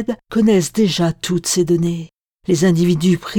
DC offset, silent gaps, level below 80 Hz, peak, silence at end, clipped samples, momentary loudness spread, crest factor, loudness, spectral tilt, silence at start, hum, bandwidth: under 0.1%; 2.13-2.39 s; -48 dBFS; -4 dBFS; 0 s; under 0.1%; 7 LU; 12 dB; -16 LUFS; -5.5 dB/octave; 0 s; none; 18.5 kHz